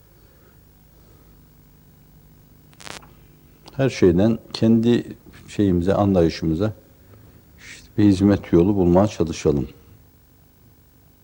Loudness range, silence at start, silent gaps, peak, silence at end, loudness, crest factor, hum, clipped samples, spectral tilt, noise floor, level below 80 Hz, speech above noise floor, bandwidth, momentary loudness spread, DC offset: 4 LU; 2.85 s; none; -2 dBFS; 1.55 s; -19 LUFS; 20 dB; none; under 0.1%; -7.5 dB/octave; -53 dBFS; -46 dBFS; 35 dB; 16.5 kHz; 21 LU; under 0.1%